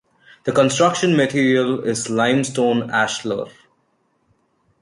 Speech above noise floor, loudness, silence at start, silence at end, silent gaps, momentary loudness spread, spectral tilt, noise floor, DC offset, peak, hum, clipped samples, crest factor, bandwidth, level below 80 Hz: 47 dB; -18 LUFS; 0.45 s; 1.3 s; none; 10 LU; -4.5 dB/octave; -65 dBFS; under 0.1%; -2 dBFS; none; under 0.1%; 18 dB; 11.5 kHz; -60 dBFS